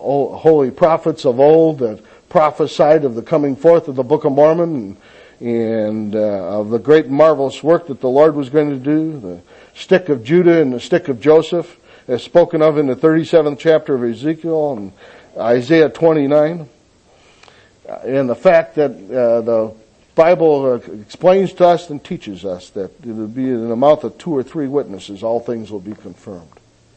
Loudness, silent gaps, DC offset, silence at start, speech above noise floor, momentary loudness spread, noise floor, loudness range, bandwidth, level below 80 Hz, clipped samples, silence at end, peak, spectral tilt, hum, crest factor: -15 LUFS; none; under 0.1%; 0 s; 36 dB; 15 LU; -51 dBFS; 4 LU; 8.6 kHz; -56 dBFS; under 0.1%; 0.55 s; 0 dBFS; -7.5 dB/octave; none; 16 dB